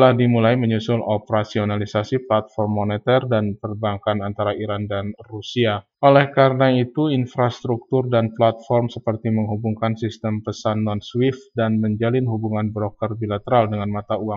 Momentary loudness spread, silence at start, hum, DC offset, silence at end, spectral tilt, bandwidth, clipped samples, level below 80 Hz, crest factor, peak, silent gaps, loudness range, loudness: 9 LU; 0 s; none; under 0.1%; 0 s; -8 dB/octave; 7.2 kHz; under 0.1%; -58 dBFS; 18 dB; 0 dBFS; none; 4 LU; -21 LUFS